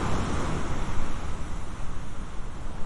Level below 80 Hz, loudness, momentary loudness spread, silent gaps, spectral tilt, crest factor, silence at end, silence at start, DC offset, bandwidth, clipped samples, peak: -32 dBFS; -34 LUFS; 10 LU; none; -5.5 dB/octave; 14 dB; 0 s; 0 s; under 0.1%; 11 kHz; under 0.1%; -10 dBFS